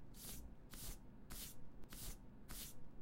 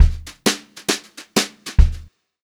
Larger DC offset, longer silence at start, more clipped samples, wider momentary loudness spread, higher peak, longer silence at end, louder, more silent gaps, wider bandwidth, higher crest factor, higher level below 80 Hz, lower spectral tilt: neither; about the same, 0 s vs 0 s; neither; about the same, 6 LU vs 6 LU; second, -38 dBFS vs 0 dBFS; second, 0 s vs 0.45 s; second, -55 LUFS vs -21 LUFS; neither; about the same, 16 kHz vs 17 kHz; about the same, 14 dB vs 18 dB; second, -58 dBFS vs -22 dBFS; about the same, -3 dB/octave vs -4 dB/octave